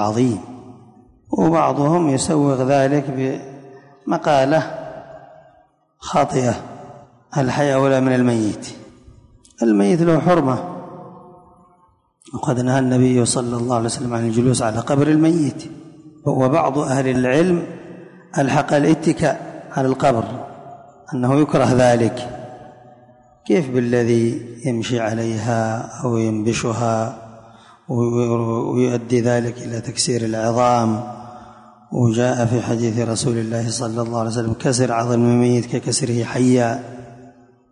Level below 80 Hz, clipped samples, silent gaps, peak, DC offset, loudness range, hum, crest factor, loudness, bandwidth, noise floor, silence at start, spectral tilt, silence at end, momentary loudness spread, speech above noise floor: -50 dBFS; under 0.1%; none; -4 dBFS; under 0.1%; 3 LU; none; 14 dB; -18 LUFS; 11 kHz; -57 dBFS; 0 s; -6 dB/octave; 0.4 s; 17 LU; 40 dB